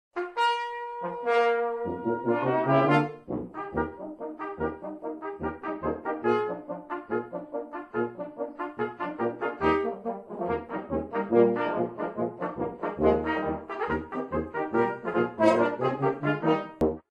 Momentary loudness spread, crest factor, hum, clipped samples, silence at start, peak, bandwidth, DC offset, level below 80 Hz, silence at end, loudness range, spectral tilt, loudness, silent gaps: 13 LU; 20 dB; none; under 0.1%; 0.15 s; -8 dBFS; 10 kHz; under 0.1%; -54 dBFS; 0.1 s; 5 LU; -7.5 dB/octave; -29 LUFS; none